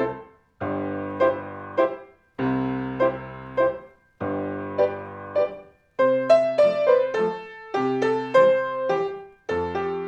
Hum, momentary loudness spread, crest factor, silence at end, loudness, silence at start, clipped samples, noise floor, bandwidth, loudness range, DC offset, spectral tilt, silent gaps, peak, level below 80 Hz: none; 16 LU; 18 dB; 0 s; -24 LUFS; 0 s; under 0.1%; -43 dBFS; 8.2 kHz; 6 LU; under 0.1%; -7 dB/octave; none; -6 dBFS; -60 dBFS